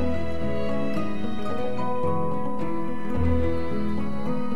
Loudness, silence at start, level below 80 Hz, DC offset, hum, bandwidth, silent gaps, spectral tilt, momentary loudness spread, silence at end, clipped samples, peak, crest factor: -28 LUFS; 0 s; -40 dBFS; 7%; none; 12 kHz; none; -8.5 dB/octave; 5 LU; 0 s; under 0.1%; -10 dBFS; 16 dB